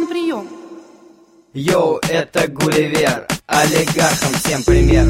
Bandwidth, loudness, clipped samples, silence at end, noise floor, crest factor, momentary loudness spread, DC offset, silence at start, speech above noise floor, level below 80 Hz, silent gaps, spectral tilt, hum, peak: 16.5 kHz; -16 LUFS; under 0.1%; 0 s; -47 dBFS; 16 dB; 9 LU; under 0.1%; 0 s; 32 dB; -26 dBFS; none; -4.5 dB/octave; none; 0 dBFS